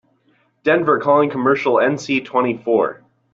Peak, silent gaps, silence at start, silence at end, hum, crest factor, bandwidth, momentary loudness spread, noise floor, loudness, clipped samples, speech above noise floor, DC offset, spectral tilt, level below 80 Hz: -2 dBFS; none; 0.65 s; 0.4 s; none; 16 dB; 7.8 kHz; 5 LU; -60 dBFS; -17 LUFS; under 0.1%; 44 dB; under 0.1%; -6 dB/octave; -62 dBFS